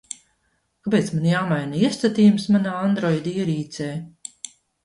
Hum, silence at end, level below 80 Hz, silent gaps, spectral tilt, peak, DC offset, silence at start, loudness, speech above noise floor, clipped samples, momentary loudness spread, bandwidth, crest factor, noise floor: none; 0.4 s; -60 dBFS; none; -6.5 dB/octave; -6 dBFS; under 0.1%; 0.85 s; -21 LUFS; 49 dB; under 0.1%; 20 LU; 11.5 kHz; 16 dB; -69 dBFS